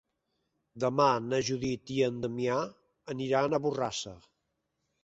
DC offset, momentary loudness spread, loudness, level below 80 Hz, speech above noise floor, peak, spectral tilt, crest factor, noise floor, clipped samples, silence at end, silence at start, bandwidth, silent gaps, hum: under 0.1%; 11 LU; -31 LUFS; -66 dBFS; 51 dB; -12 dBFS; -5 dB/octave; 20 dB; -81 dBFS; under 0.1%; 0.85 s; 0.75 s; 8.2 kHz; none; none